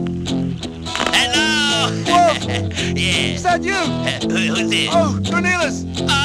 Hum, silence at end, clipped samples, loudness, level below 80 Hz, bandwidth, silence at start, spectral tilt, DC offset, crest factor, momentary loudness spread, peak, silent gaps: none; 0 s; under 0.1%; -17 LUFS; -40 dBFS; 15.5 kHz; 0 s; -4 dB/octave; under 0.1%; 16 dB; 8 LU; -2 dBFS; none